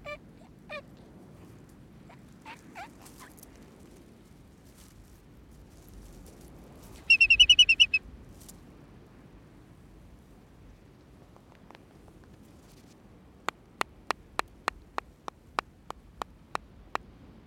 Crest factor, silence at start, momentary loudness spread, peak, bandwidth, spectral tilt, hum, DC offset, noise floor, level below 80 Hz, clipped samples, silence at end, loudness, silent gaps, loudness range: 24 dB; 0.05 s; 32 LU; -8 dBFS; 16.5 kHz; -0.5 dB/octave; none; under 0.1%; -55 dBFS; -56 dBFS; under 0.1%; 9.5 s; -23 LUFS; none; 24 LU